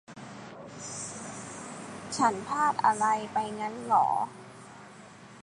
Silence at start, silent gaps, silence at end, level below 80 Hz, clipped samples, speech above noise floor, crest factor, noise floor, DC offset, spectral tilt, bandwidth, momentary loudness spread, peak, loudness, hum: 0.1 s; none; 0 s; -70 dBFS; under 0.1%; 22 dB; 20 dB; -50 dBFS; under 0.1%; -3.5 dB/octave; 11.5 kHz; 23 LU; -10 dBFS; -29 LUFS; none